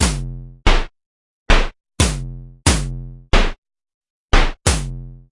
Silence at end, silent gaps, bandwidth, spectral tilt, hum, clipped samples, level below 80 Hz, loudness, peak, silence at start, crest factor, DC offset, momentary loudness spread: 0.15 s; 1.06-1.46 s, 3.58-3.62 s, 3.94-4.01 s, 4.10-4.28 s; 11.5 kHz; -3.5 dB/octave; none; under 0.1%; -20 dBFS; -20 LUFS; 0 dBFS; 0 s; 18 dB; under 0.1%; 14 LU